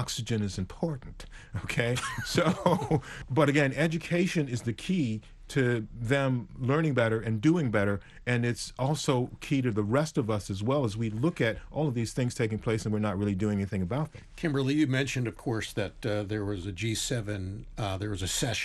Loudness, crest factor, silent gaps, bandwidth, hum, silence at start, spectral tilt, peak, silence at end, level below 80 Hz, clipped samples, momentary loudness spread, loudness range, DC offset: -30 LUFS; 18 dB; none; 12.5 kHz; none; 0 s; -5.5 dB/octave; -10 dBFS; 0 s; -50 dBFS; under 0.1%; 8 LU; 3 LU; under 0.1%